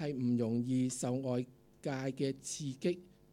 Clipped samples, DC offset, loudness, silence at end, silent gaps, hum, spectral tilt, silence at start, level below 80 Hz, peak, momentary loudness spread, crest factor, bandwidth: under 0.1%; under 0.1%; -37 LUFS; 0.25 s; none; none; -6 dB/octave; 0 s; -72 dBFS; -22 dBFS; 8 LU; 14 dB; 14 kHz